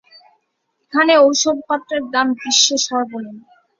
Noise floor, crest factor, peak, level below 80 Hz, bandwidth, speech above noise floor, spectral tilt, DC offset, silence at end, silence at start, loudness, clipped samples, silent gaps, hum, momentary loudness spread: -70 dBFS; 18 dB; 0 dBFS; -66 dBFS; 7.6 kHz; 54 dB; -0.5 dB/octave; under 0.1%; 0.4 s; 0.95 s; -15 LUFS; under 0.1%; none; none; 12 LU